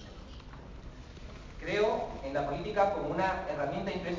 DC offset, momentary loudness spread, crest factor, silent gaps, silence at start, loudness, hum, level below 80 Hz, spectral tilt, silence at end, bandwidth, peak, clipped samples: under 0.1%; 19 LU; 20 dB; none; 0 s; -32 LUFS; none; -50 dBFS; -6 dB/octave; 0 s; 7.6 kHz; -14 dBFS; under 0.1%